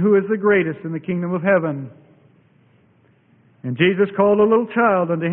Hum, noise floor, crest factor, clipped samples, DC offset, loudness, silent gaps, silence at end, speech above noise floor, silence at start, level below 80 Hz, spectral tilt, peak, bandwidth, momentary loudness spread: none; -56 dBFS; 16 dB; under 0.1%; under 0.1%; -18 LUFS; none; 0 s; 39 dB; 0 s; -60 dBFS; -12 dB/octave; -4 dBFS; 3.7 kHz; 13 LU